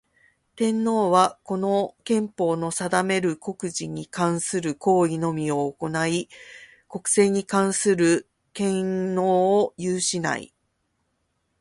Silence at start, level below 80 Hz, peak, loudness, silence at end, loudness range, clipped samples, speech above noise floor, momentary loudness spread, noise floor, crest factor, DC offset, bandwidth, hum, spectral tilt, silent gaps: 0.55 s; -64 dBFS; -4 dBFS; -23 LUFS; 1.15 s; 3 LU; under 0.1%; 50 dB; 10 LU; -73 dBFS; 20 dB; under 0.1%; 11.5 kHz; none; -4.5 dB/octave; none